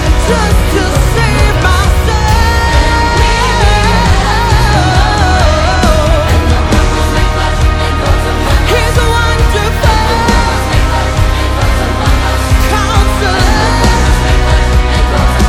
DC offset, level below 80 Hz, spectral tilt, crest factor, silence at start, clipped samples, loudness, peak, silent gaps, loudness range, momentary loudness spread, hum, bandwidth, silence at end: under 0.1%; -12 dBFS; -5 dB/octave; 8 dB; 0 s; 0.3%; -10 LUFS; 0 dBFS; none; 2 LU; 3 LU; none; 16 kHz; 0 s